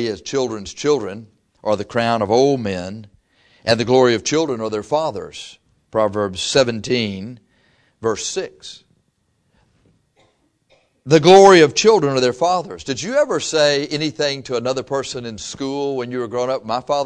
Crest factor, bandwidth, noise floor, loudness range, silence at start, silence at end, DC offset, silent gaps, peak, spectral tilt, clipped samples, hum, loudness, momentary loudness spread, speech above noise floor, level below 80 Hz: 18 dB; 10.5 kHz; -65 dBFS; 12 LU; 0 s; 0 s; under 0.1%; none; 0 dBFS; -4.5 dB/octave; under 0.1%; none; -17 LUFS; 15 LU; 48 dB; -54 dBFS